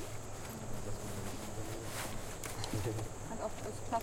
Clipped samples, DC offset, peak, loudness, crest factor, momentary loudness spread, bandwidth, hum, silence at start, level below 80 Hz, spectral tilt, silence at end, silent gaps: under 0.1%; under 0.1%; -22 dBFS; -42 LUFS; 18 dB; 6 LU; 16.5 kHz; none; 0 s; -50 dBFS; -4.5 dB/octave; 0 s; none